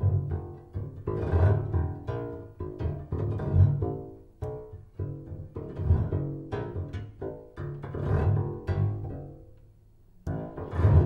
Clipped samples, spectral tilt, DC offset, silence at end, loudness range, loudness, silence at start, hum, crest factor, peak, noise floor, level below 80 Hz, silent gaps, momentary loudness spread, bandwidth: under 0.1%; -10.5 dB/octave; under 0.1%; 0 s; 5 LU; -31 LUFS; 0 s; none; 20 dB; -8 dBFS; -56 dBFS; -40 dBFS; none; 15 LU; 4.1 kHz